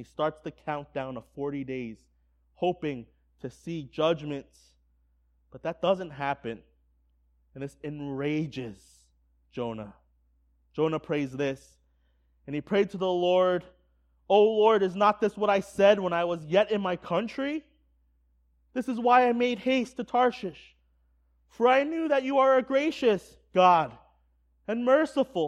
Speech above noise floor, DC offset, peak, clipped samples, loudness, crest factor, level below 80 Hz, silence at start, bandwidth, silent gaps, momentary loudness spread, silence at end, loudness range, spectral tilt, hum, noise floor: 41 dB; under 0.1%; -8 dBFS; under 0.1%; -27 LUFS; 20 dB; -64 dBFS; 0 s; 11.5 kHz; none; 17 LU; 0 s; 11 LU; -6 dB/octave; none; -67 dBFS